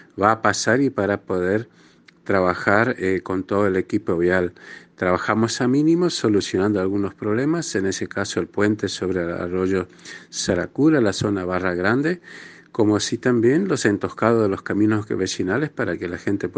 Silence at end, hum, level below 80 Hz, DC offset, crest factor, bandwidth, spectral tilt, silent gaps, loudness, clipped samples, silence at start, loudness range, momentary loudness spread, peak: 0 s; none; -58 dBFS; under 0.1%; 20 dB; 10 kHz; -5.5 dB/octave; none; -21 LUFS; under 0.1%; 0.15 s; 2 LU; 7 LU; 0 dBFS